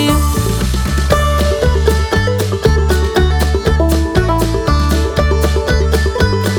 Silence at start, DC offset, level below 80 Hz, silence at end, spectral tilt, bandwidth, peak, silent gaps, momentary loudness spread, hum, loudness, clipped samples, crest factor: 0 s; under 0.1%; -16 dBFS; 0 s; -5.5 dB/octave; 18.5 kHz; 0 dBFS; none; 2 LU; none; -14 LUFS; under 0.1%; 12 dB